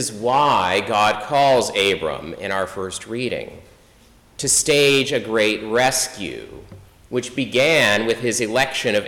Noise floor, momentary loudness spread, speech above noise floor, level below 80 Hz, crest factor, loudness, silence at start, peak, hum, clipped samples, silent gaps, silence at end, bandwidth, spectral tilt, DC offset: -51 dBFS; 13 LU; 32 dB; -52 dBFS; 12 dB; -18 LUFS; 0 s; -8 dBFS; none; under 0.1%; none; 0 s; 18 kHz; -2.5 dB/octave; under 0.1%